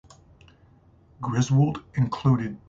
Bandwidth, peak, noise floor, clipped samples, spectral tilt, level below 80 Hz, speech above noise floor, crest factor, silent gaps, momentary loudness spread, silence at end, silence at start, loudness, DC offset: 7.6 kHz; -10 dBFS; -56 dBFS; under 0.1%; -7 dB/octave; -54 dBFS; 33 dB; 16 dB; none; 7 LU; 0.1 s; 1.2 s; -24 LUFS; under 0.1%